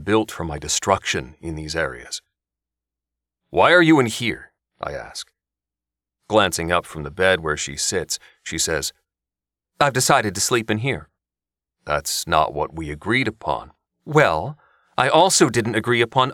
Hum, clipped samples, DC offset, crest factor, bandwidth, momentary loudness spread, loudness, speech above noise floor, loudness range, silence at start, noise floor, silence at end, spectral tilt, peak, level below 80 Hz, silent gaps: none; under 0.1%; under 0.1%; 20 dB; 18 kHz; 16 LU; -20 LUFS; 69 dB; 4 LU; 0 s; -90 dBFS; 0 s; -3.5 dB/octave; -2 dBFS; -46 dBFS; none